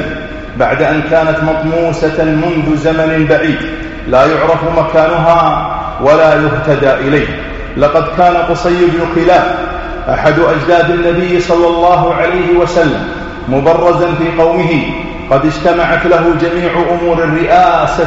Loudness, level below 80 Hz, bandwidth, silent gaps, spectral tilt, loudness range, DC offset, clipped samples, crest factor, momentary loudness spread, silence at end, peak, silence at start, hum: -10 LUFS; -28 dBFS; 8 kHz; none; -7 dB/octave; 2 LU; under 0.1%; 0.1%; 10 dB; 8 LU; 0 s; 0 dBFS; 0 s; none